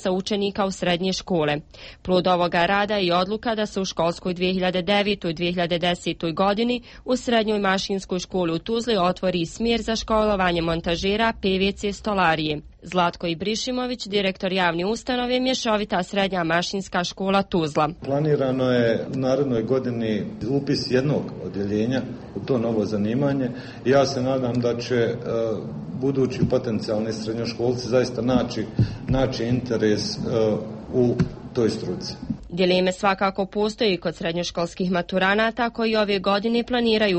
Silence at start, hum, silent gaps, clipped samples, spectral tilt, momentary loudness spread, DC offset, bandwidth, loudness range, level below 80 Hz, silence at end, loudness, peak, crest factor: 0 s; none; none; under 0.1%; -5.5 dB/octave; 6 LU; under 0.1%; 8.4 kHz; 2 LU; -46 dBFS; 0 s; -23 LUFS; -6 dBFS; 16 dB